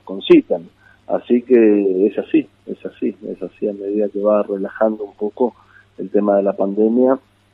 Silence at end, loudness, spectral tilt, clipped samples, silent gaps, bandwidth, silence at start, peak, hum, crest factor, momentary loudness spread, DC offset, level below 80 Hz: 0.35 s; -17 LUFS; -9 dB/octave; under 0.1%; none; 4.2 kHz; 0.05 s; -2 dBFS; none; 16 dB; 12 LU; under 0.1%; -62 dBFS